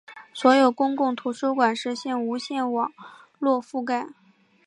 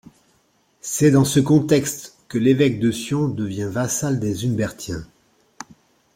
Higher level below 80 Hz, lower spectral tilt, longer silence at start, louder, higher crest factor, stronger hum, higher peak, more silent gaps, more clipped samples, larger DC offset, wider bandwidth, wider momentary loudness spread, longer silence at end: second, -80 dBFS vs -52 dBFS; second, -4 dB/octave vs -5.5 dB/octave; second, 0.1 s vs 0.85 s; second, -24 LUFS vs -20 LUFS; about the same, 20 dB vs 18 dB; neither; about the same, -4 dBFS vs -2 dBFS; neither; neither; neither; second, 11 kHz vs 16.5 kHz; second, 10 LU vs 17 LU; second, 0.55 s vs 1.1 s